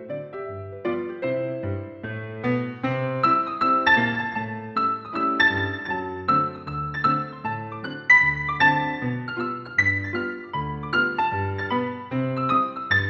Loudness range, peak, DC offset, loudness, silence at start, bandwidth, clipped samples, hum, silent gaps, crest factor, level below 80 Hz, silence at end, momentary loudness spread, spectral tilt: 4 LU; -6 dBFS; under 0.1%; -23 LUFS; 0 s; 7.4 kHz; under 0.1%; none; none; 18 dB; -54 dBFS; 0 s; 12 LU; -6.5 dB/octave